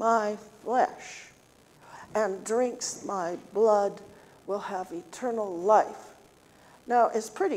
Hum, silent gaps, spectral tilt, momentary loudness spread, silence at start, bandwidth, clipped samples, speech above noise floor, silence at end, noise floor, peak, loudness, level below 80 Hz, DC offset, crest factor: none; none; -4 dB/octave; 19 LU; 0 s; 15.5 kHz; under 0.1%; 31 dB; 0 s; -58 dBFS; -10 dBFS; -28 LUFS; -72 dBFS; under 0.1%; 20 dB